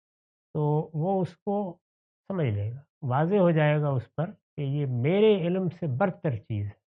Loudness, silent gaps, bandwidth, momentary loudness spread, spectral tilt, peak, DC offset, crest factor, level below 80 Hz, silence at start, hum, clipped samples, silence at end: -27 LUFS; 1.42-1.46 s, 1.81-2.24 s, 2.89-3.01 s, 4.42-4.57 s; 4.1 kHz; 13 LU; -7.5 dB/octave; -10 dBFS; under 0.1%; 16 dB; -70 dBFS; 0.55 s; none; under 0.1%; 0.2 s